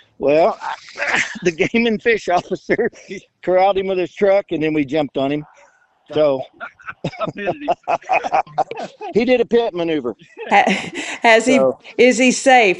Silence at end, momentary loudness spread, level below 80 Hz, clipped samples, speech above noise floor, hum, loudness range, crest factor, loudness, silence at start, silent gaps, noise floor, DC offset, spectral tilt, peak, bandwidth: 0 s; 15 LU; -54 dBFS; under 0.1%; 35 dB; none; 6 LU; 18 dB; -17 LUFS; 0.2 s; none; -53 dBFS; under 0.1%; -4 dB/octave; 0 dBFS; 11 kHz